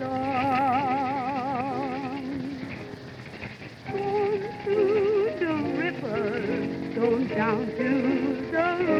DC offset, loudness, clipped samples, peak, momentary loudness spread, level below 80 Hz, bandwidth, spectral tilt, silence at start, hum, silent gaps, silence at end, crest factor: under 0.1%; -27 LUFS; under 0.1%; -12 dBFS; 14 LU; -58 dBFS; 10.5 kHz; -7.5 dB/octave; 0 s; none; none; 0 s; 16 dB